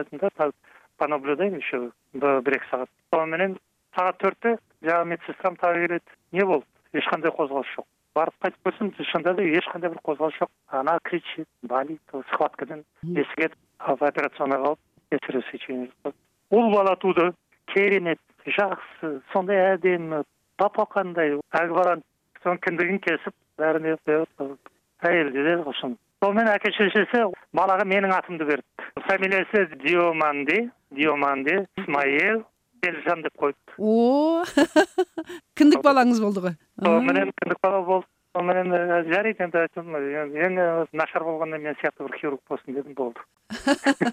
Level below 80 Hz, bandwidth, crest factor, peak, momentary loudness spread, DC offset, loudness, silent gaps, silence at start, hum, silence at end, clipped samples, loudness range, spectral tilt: -70 dBFS; 15 kHz; 20 dB; -4 dBFS; 11 LU; under 0.1%; -24 LUFS; none; 0 s; none; 0 s; under 0.1%; 6 LU; -5.5 dB/octave